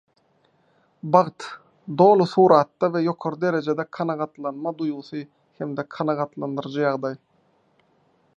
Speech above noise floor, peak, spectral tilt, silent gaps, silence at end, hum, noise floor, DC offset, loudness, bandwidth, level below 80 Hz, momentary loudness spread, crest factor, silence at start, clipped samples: 42 dB; -2 dBFS; -7.5 dB/octave; none; 1.2 s; none; -64 dBFS; under 0.1%; -22 LUFS; 9.2 kHz; -74 dBFS; 19 LU; 22 dB; 1.05 s; under 0.1%